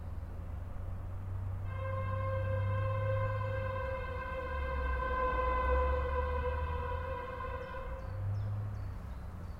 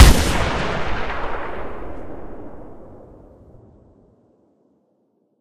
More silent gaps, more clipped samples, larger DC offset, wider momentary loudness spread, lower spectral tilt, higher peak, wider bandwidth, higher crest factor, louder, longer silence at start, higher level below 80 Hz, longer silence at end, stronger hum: neither; second, under 0.1% vs 0.2%; neither; second, 11 LU vs 23 LU; first, -8 dB/octave vs -4.5 dB/octave; second, -20 dBFS vs 0 dBFS; second, 5.6 kHz vs 15.5 kHz; about the same, 16 dB vs 20 dB; second, -37 LUFS vs -22 LUFS; about the same, 0 s vs 0 s; second, -40 dBFS vs -24 dBFS; about the same, 0 s vs 0 s; neither